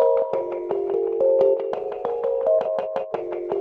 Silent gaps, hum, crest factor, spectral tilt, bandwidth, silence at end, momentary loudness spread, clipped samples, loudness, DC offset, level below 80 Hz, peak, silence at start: none; none; 16 dB; -8 dB/octave; 4.8 kHz; 0 s; 9 LU; under 0.1%; -23 LUFS; under 0.1%; -62 dBFS; -8 dBFS; 0 s